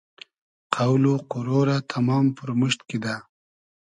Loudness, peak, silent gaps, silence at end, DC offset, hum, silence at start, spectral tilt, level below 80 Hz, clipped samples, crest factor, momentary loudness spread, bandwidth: -23 LUFS; -4 dBFS; none; 0.7 s; under 0.1%; none; 0.7 s; -6.5 dB/octave; -66 dBFS; under 0.1%; 20 dB; 9 LU; 10.5 kHz